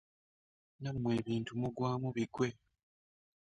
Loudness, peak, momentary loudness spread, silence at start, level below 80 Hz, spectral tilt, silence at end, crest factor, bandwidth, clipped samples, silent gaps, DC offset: -37 LUFS; -20 dBFS; 4 LU; 0.8 s; -68 dBFS; -7 dB/octave; 0.85 s; 18 dB; 10 kHz; under 0.1%; none; under 0.1%